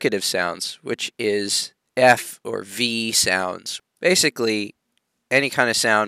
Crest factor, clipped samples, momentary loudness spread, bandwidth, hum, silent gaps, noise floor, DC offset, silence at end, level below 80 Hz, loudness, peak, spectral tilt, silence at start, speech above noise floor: 20 dB; under 0.1%; 12 LU; 16 kHz; none; none; -72 dBFS; under 0.1%; 0 s; -66 dBFS; -20 LUFS; -2 dBFS; -2 dB/octave; 0 s; 51 dB